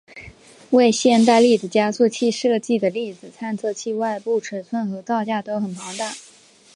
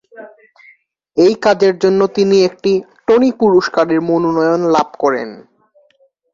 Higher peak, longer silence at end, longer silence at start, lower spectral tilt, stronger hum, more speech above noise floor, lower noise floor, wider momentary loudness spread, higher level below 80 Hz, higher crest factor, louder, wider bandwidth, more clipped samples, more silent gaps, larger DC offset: about the same, -2 dBFS vs 0 dBFS; second, 0.55 s vs 0.95 s; about the same, 0.15 s vs 0.15 s; second, -4.5 dB/octave vs -6 dB/octave; neither; second, 31 dB vs 43 dB; second, -50 dBFS vs -56 dBFS; first, 14 LU vs 5 LU; second, -64 dBFS vs -56 dBFS; about the same, 18 dB vs 14 dB; second, -20 LUFS vs -13 LUFS; first, 11.5 kHz vs 7.4 kHz; neither; neither; neither